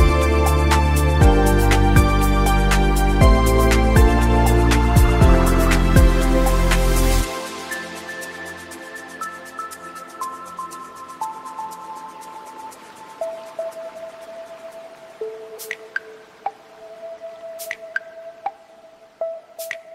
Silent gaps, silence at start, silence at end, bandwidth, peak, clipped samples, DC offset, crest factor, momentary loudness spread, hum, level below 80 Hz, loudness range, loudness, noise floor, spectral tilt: none; 0 s; 0 s; 16 kHz; -2 dBFS; under 0.1%; under 0.1%; 16 dB; 21 LU; none; -22 dBFS; 18 LU; -18 LUFS; -47 dBFS; -5.5 dB/octave